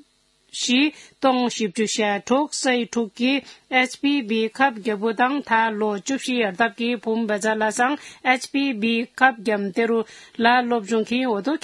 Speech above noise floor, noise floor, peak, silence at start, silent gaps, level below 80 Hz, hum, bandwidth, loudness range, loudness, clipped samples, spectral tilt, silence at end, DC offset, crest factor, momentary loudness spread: 40 dB; -62 dBFS; 0 dBFS; 0.55 s; none; -72 dBFS; none; 12 kHz; 1 LU; -22 LUFS; under 0.1%; -3.5 dB/octave; 0.05 s; under 0.1%; 22 dB; 5 LU